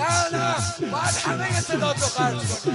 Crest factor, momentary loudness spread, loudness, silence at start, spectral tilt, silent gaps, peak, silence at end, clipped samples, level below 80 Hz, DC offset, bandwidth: 16 dB; 4 LU; -23 LUFS; 0 s; -3.5 dB/octave; none; -8 dBFS; 0 s; under 0.1%; -52 dBFS; under 0.1%; 11.5 kHz